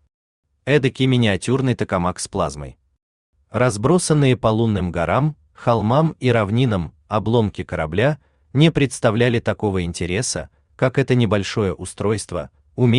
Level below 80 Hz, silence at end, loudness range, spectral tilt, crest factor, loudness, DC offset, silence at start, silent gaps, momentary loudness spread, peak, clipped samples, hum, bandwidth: -46 dBFS; 0 s; 3 LU; -6 dB/octave; 16 dB; -19 LUFS; under 0.1%; 0.65 s; 3.03-3.33 s; 9 LU; -4 dBFS; under 0.1%; none; 11 kHz